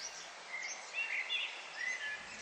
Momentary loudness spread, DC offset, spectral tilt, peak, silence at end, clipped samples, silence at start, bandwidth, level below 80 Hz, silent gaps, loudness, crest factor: 9 LU; under 0.1%; 1.5 dB/octave; -26 dBFS; 0 s; under 0.1%; 0 s; 13.5 kHz; -82 dBFS; none; -39 LUFS; 16 dB